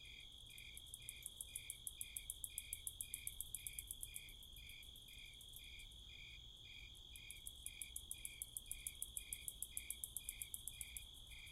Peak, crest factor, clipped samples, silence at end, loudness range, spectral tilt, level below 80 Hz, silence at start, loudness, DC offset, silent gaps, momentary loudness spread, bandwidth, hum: -26 dBFS; 26 dB; under 0.1%; 0 s; 6 LU; 0.5 dB/octave; -64 dBFS; 0 s; -51 LUFS; under 0.1%; none; 9 LU; 16 kHz; none